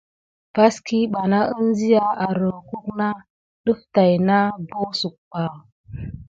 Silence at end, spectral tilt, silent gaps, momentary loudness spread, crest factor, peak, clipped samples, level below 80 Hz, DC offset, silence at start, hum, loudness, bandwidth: 0.05 s; -6.5 dB/octave; 3.30-3.64 s, 5.18-5.31 s, 5.72-5.84 s; 13 LU; 18 dB; -2 dBFS; under 0.1%; -52 dBFS; under 0.1%; 0.55 s; none; -21 LUFS; 7.8 kHz